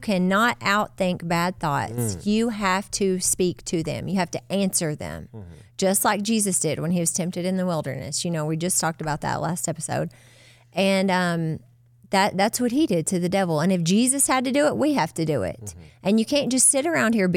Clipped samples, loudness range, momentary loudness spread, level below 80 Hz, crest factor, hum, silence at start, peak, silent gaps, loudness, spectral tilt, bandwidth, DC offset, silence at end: under 0.1%; 4 LU; 8 LU; -54 dBFS; 16 dB; none; 0 s; -6 dBFS; none; -23 LUFS; -4 dB/octave; 17 kHz; under 0.1%; 0 s